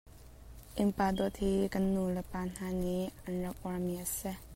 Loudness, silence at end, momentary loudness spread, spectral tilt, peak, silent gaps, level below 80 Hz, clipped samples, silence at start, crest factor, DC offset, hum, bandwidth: -35 LUFS; 0 s; 7 LU; -6 dB/octave; -18 dBFS; none; -50 dBFS; under 0.1%; 0.05 s; 16 dB; under 0.1%; none; 16 kHz